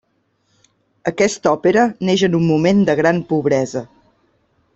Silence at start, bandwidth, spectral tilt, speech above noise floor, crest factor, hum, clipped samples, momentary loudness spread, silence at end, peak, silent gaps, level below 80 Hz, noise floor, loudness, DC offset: 1.05 s; 8.2 kHz; -6 dB/octave; 49 dB; 16 dB; none; under 0.1%; 10 LU; 0.9 s; -2 dBFS; none; -54 dBFS; -65 dBFS; -16 LUFS; under 0.1%